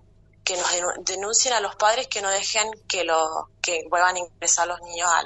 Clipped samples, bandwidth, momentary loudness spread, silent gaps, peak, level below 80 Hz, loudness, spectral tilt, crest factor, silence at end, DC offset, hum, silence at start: under 0.1%; 8.4 kHz; 7 LU; none; -6 dBFS; -58 dBFS; -23 LUFS; 0.5 dB/octave; 18 dB; 0 s; under 0.1%; none; 0.45 s